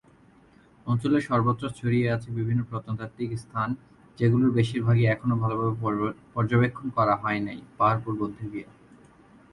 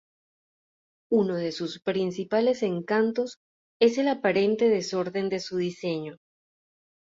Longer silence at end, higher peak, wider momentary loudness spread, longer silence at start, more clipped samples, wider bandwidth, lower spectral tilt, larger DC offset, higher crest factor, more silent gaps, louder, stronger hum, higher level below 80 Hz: about the same, 0.9 s vs 0.9 s; about the same, -10 dBFS vs -8 dBFS; about the same, 11 LU vs 9 LU; second, 0.85 s vs 1.1 s; neither; first, 11 kHz vs 7.8 kHz; first, -8.5 dB/octave vs -5.5 dB/octave; neither; about the same, 16 dB vs 18 dB; second, none vs 3.37-3.80 s; about the same, -26 LUFS vs -26 LUFS; neither; first, -56 dBFS vs -72 dBFS